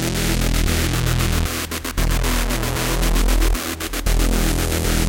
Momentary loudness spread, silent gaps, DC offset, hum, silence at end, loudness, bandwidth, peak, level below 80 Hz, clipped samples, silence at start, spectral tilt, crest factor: 4 LU; none; under 0.1%; none; 0 s; -21 LUFS; 17.5 kHz; -4 dBFS; -20 dBFS; under 0.1%; 0 s; -4 dB/octave; 14 dB